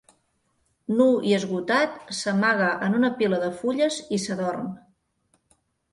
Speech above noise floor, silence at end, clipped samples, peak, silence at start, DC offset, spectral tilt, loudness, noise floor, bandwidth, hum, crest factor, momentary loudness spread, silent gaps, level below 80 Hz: 47 dB; 1.15 s; under 0.1%; -6 dBFS; 0.9 s; under 0.1%; -5 dB/octave; -24 LUFS; -70 dBFS; 11.5 kHz; none; 18 dB; 9 LU; none; -66 dBFS